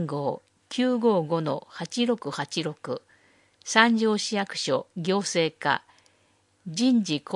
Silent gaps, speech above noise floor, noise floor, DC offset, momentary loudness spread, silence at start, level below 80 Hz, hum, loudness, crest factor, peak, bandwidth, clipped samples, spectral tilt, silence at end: none; 40 dB; -65 dBFS; under 0.1%; 14 LU; 0 s; -78 dBFS; none; -26 LUFS; 26 dB; -2 dBFS; 11.5 kHz; under 0.1%; -4 dB/octave; 0 s